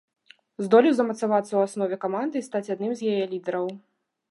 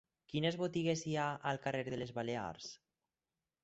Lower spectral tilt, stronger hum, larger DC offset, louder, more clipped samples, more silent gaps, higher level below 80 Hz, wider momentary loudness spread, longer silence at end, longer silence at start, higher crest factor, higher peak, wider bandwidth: first, -6 dB/octave vs -4.5 dB/octave; neither; neither; first, -25 LUFS vs -39 LUFS; neither; neither; second, -82 dBFS vs -72 dBFS; about the same, 11 LU vs 11 LU; second, 0.5 s vs 0.85 s; first, 0.6 s vs 0.3 s; about the same, 20 dB vs 18 dB; first, -4 dBFS vs -22 dBFS; first, 11.5 kHz vs 8 kHz